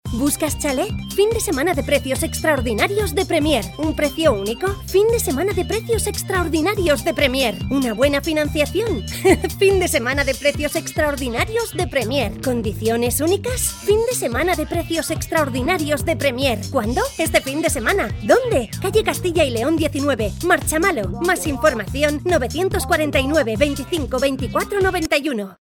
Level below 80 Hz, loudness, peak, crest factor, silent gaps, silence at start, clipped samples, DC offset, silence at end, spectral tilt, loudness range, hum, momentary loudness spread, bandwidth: -34 dBFS; -19 LUFS; 0 dBFS; 18 dB; none; 0.05 s; under 0.1%; under 0.1%; 0.2 s; -4.5 dB/octave; 2 LU; none; 5 LU; 18 kHz